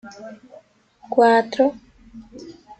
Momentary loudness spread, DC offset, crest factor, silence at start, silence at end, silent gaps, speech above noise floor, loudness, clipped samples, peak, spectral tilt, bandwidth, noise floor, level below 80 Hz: 25 LU; under 0.1%; 20 dB; 0.05 s; 0.3 s; none; 25 dB; -18 LUFS; under 0.1%; -2 dBFS; -5 dB/octave; 8.8 kHz; -44 dBFS; -60 dBFS